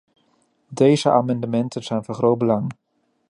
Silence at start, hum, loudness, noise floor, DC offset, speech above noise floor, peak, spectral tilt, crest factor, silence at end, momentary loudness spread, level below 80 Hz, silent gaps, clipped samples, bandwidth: 0.7 s; none; -20 LUFS; -64 dBFS; under 0.1%; 45 dB; -2 dBFS; -7 dB/octave; 18 dB; 0.6 s; 10 LU; -64 dBFS; none; under 0.1%; 11 kHz